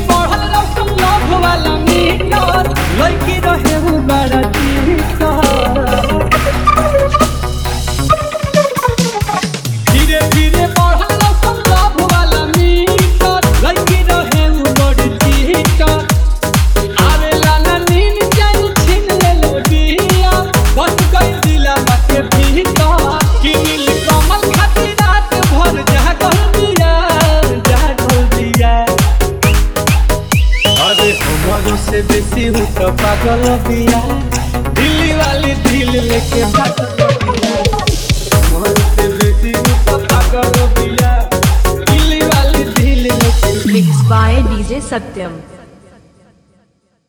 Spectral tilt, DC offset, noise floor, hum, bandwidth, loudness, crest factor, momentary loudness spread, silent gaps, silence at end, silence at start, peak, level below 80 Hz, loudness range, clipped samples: -5 dB/octave; under 0.1%; -56 dBFS; none; over 20 kHz; -11 LUFS; 10 dB; 3 LU; none; 1.45 s; 0 s; 0 dBFS; -14 dBFS; 2 LU; under 0.1%